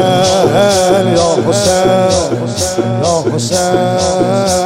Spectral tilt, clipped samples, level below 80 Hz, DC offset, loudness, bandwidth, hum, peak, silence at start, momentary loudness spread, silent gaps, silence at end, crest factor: -4.5 dB/octave; under 0.1%; -42 dBFS; under 0.1%; -11 LUFS; 16.5 kHz; none; 0 dBFS; 0 s; 5 LU; none; 0 s; 10 dB